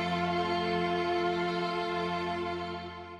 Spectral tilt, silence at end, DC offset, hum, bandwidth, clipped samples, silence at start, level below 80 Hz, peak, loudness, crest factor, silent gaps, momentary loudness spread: -6 dB/octave; 0 s; under 0.1%; none; 10.5 kHz; under 0.1%; 0 s; -60 dBFS; -18 dBFS; -31 LUFS; 12 dB; none; 6 LU